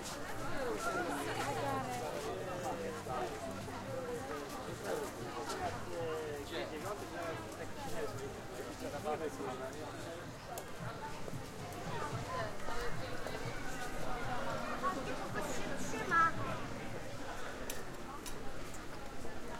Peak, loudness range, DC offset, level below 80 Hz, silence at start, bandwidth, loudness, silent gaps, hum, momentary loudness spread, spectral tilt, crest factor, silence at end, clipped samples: -20 dBFS; 6 LU; under 0.1%; -54 dBFS; 0 s; 16.5 kHz; -41 LUFS; none; none; 8 LU; -4.5 dB/octave; 20 dB; 0 s; under 0.1%